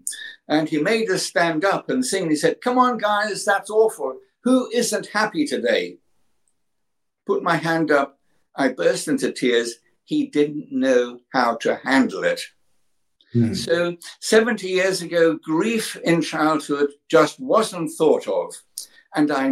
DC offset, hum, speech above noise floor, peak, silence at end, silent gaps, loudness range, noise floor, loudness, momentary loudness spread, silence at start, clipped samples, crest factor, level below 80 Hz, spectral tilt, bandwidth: under 0.1%; none; 59 dB; -4 dBFS; 0 s; none; 3 LU; -80 dBFS; -21 LUFS; 9 LU; 0.05 s; under 0.1%; 18 dB; -68 dBFS; -4.5 dB/octave; 16 kHz